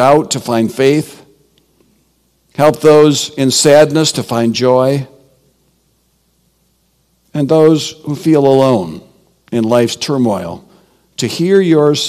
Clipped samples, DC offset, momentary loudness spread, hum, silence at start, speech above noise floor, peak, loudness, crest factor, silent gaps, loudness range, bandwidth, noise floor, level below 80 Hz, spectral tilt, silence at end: 0.9%; under 0.1%; 16 LU; none; 0 s; 47 dB; 0 dBFS; -11 LUFS; 12 dB; none; 6 LU; 15 kHz; -58 dBFS; -54 dBFS; -5 dB/octave; 0 s